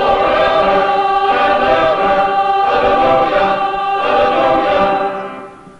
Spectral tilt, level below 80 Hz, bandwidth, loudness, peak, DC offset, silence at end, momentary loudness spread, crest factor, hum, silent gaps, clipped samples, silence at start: -5.5 dB/octave; -40 dBFS; 8.2 kHz; -13 LUFS; 0 dBFS; under 0.1%; 0.1 s; 4 LU; 12 dB; none; none; under 0.1%; 0 s